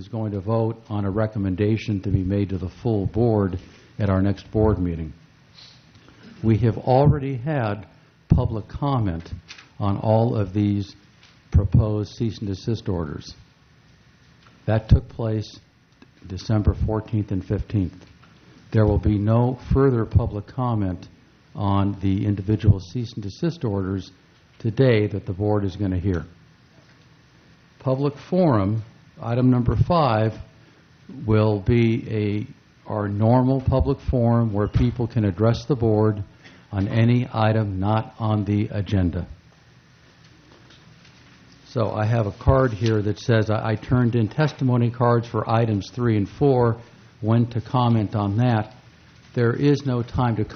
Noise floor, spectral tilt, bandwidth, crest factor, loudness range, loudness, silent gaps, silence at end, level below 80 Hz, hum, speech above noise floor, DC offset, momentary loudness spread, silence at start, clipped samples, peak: -54 dBFS; -9 dB/octave; 6.6 kHz; 20 dB; 5 LU; -22 LUFS; none; 0 s; -38 dBFS; none; 33 dB; under 0.1%; 11 LU; 0 s; under 0.1%; -2 dBFS